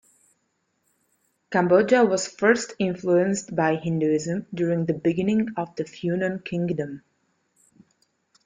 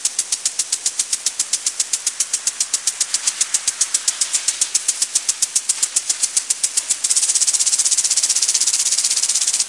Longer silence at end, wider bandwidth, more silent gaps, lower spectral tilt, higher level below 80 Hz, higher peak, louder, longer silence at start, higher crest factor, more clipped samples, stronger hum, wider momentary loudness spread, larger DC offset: first, 1.45 s vs 0 s; second, 9.6 kHz vs 11.5 kHz; neither; first, -6 dB/octave vs 4.5 dB/octave; first, -64 dBFS vs -74 dBFS; second, -4 dBFS vs 0 dBFS; second, -23 LUFS vs -16 LUFS; first, 1.5 s vs 0 s; about the same, 20 dB vs 20 dB; neither; neither; first, 10 LU vs 5 LU; neither